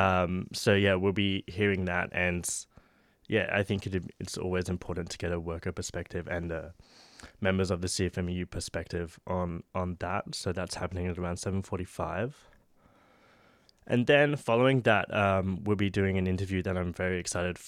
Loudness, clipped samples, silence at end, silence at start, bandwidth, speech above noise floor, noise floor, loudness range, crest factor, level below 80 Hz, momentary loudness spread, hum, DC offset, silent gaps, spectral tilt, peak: -30 LUFS; under 0.1%; 0 s; 0 s; 14.5 kHz; 34 dB; -64 dBFS; 8 LU; 22 dB; -54 dBFS; 11 LU; none; under 0.1%; none; -5 dB/octave; -8 dBFS